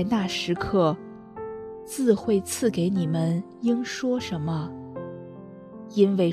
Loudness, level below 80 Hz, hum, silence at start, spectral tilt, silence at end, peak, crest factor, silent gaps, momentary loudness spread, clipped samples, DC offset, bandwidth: -25 LUFS; -56 dBFS; none; 0 s; -6 dB/octave; 0 s; -6 dBFS; 18 dB; none; 16 LU; under 0.1%; under 0.1%; 13.5 kHz